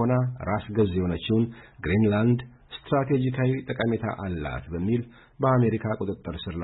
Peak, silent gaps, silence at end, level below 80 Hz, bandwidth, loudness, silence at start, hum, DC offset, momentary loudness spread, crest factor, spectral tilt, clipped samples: -12 dBFS; none; 0 s; -48 dBFS; 4.1 kHz; -26 LUFS; 0 s; none; under 0.1%; 10 LU; 14 dB; -12 dB/octave; under 0.1%